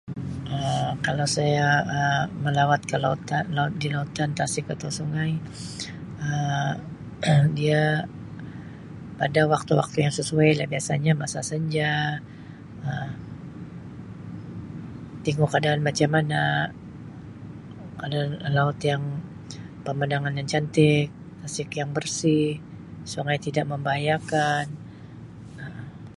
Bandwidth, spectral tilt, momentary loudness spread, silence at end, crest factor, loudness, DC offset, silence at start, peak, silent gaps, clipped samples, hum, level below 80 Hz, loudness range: 11.5 kHz; -5.5 dB/octave; 19 LU; 0.05 s; 20 dB; -25 LUFS; under 0.1%; 0.05 s; -6 dBFS; none; under 0.1%; none; -54 dBFS; 5 LU